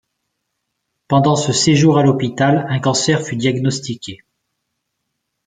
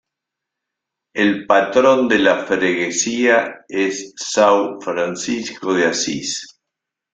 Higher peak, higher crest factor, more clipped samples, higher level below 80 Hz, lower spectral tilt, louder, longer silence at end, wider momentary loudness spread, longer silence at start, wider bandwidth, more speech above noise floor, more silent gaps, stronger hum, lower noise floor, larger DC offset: about the same, -2 dBFS vs -2 dBFS; about the same, 16 dB vs 18 dB; neither; first, -54 dBFS vs -62 dBFS; first, -5 dB/octave vs -3 dB/octave; about the same, -15 LUFS vs -17 LUFS; first, 1.3 s vs 0.65 s; about the same, 11 LU vs 10 LU; about the same, 1.1 s vs 1.15 s; about the same, 9.6 kHz vs 9.4 kHz; second, 59 dB vs 65 dB; neither; neither; second, -74 dBFS vs -82 dBFS; neither